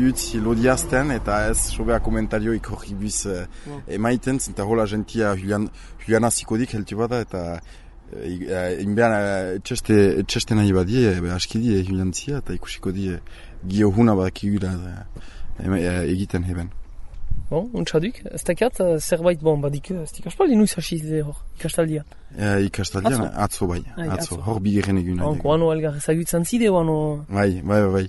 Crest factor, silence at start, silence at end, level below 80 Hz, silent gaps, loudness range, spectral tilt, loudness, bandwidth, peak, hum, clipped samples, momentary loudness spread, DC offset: 18 dB; 0 s; 0 s; -36 dBFS; none; 4 LU; -5.5 dB/octave; -22 LUFS; 12 kHz; -4 dBFS; none; under 0.1%; 12 LU; under 0.1%